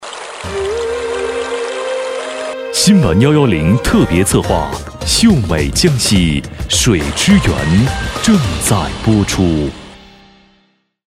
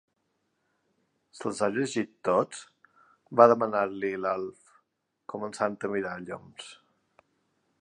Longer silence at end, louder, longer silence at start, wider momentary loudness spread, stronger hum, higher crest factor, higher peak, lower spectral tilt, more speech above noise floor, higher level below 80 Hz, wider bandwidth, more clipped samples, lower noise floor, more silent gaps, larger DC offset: first, 1.25 s vs 1.05 s; first, -13 LUFS vs -28 LUFS; second, 0 s vs 1.35 s; second, 11 LU vs 22 LU; neither; second, 14 dB vs 26 dB; first, 0 dBFS vs -4 dBFS; about the same, -4.5 dB/octave vs -5 dB/octave; second, 45 dB vs 49 dB; first, -28 dBFS vs -72 dBFS; first, 16 kHz vs 11 kHz; neither; second, -57 dBFS vs -77 dBFS; neither; neither